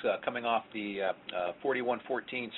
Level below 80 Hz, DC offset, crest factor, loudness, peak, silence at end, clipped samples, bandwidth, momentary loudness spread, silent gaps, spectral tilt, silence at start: -74 dBFS; under 0.1%; 18 dB; -34 LUFS; -16 dBFS; 0 s; under 0.1%; 4.2 kHz; 4 LU; none; -2 dB/octave; 0 s